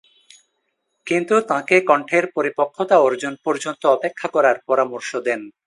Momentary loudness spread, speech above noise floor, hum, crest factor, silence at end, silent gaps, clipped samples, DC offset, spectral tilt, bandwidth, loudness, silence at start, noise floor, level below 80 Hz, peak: 8 LU; 54 dB; none; 20 dB; 0.15 s; none; under 0.1%; under 0.1%; -4.5 dB/octave; 11.5 kHz; -19 LUFS; 1.05 s; -72 dBFS; -74 dBFS; 0 dBFS